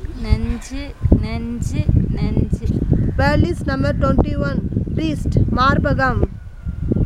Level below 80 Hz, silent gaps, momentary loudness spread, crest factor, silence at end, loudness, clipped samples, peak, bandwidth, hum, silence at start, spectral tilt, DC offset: -24 dBFS; none; 9 LU; 18 dB; 0 s; -19 LUFS; under 0.1%; 0 dBFS; 11.5 kHz; none; 0 s; -7.5 dB/octave; under 0.1%